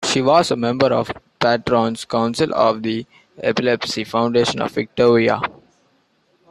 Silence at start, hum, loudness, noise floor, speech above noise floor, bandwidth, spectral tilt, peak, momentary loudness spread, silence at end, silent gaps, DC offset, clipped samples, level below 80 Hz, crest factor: 0 s; none; -18 LUFS; -61 dBFS; 44 dB; 13 kHz; -5 dB/octave; -2 dBFS; 8 LU; 1 s; none; under 0.1%; under 0.1%; -54 dBFS; 16 dB